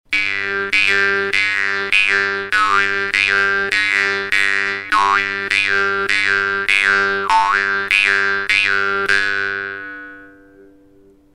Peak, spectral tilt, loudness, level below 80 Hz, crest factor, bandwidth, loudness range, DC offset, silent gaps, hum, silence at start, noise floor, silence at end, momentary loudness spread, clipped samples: 0 dBFS; -1.5 dB/octave; -15 LUFS; -52 dBFS; 18 dB; 16 kHz; 2 LU; under 0.1%; none; none; 0.1 s; -49 dBFS; 1.05 s; 5 LU; under 0.1%